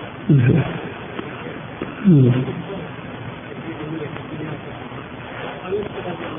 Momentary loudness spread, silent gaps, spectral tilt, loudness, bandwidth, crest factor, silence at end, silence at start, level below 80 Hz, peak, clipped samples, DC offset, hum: 17 LU; none; -12.5 dB/octave; -22 LUFS; 3.7 kHz; 18 dB; 0 s; 0 s; -48 dBFS; -4 dBFS; under 0.1%; under 0.1%; none